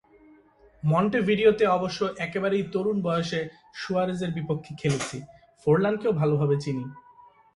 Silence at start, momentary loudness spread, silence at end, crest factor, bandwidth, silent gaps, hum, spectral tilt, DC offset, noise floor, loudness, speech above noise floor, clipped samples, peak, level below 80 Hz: 0.85 s; 11 LU; 0.55 s; 18 dB; 11.5 kHz; none; none; -6.5 dB/octave; under 0.1%; -57 dBFS; -26 LUFS; 32 dB; under 0.1%; -8 dBFS; -60 dBFS